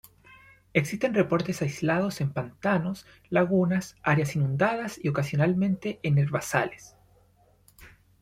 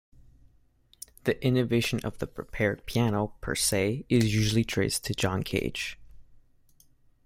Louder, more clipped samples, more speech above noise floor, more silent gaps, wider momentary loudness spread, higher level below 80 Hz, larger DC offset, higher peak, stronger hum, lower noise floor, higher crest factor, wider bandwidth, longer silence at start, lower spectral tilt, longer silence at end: about the same, -27 LUFS vs -28 LUFS; neither; about the same, 36 dB vs 35 dB; neither; second, 6 LU vs 10 LU; second, -60 dBFS vs -48 dBFS; neither; first, -6 dBFS vs -10 dBFS; first, 50 Hz at -55 dBFS vs none; about the same, -62 dBFS vs -63 dBFS; about the same, 20 dB vs 20 dB; about the same, 15.5 kHz vs 16.5 kHz; second, 0.75 s vs 1.25 s; first, -6.5 dB/octave vs -5 dB/octave; second, 0.35 s vs 0.9 s